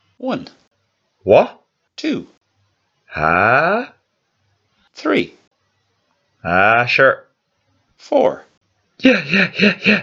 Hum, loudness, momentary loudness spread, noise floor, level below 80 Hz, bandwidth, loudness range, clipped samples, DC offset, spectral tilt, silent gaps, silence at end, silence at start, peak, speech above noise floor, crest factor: none; -16 LUFS; 15 LU; -67 dBFS; -54 dBFS; 7.4 kHz; 4 LU; under 0.1%; under 0.1%; -6 dB/octave; 0.67-0.71 s, 2.37-2.41 s, 5.47-5.51 s, 8.57-8.61 s; 0 s; 0.2 s; 0 dBFS; 52 dB; 18 dB